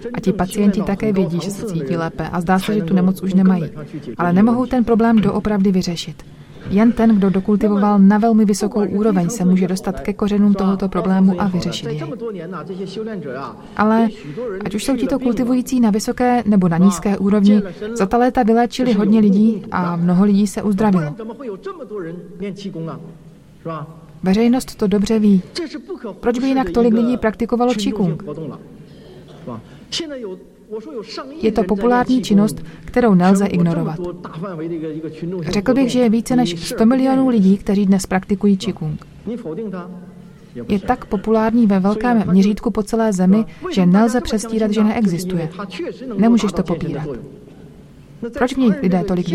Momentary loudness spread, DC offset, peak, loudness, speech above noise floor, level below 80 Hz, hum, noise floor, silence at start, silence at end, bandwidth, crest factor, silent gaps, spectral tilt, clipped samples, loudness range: 15 LU; under 0.1%; 0 dBFS; -17 LUFS; 24 dB; -42 dBFS; none; -41 dBFS; 0 s; 0 s; 13.5 kHz; 16 dB; none; -7 dB/octave; under 0.1%; 6 LU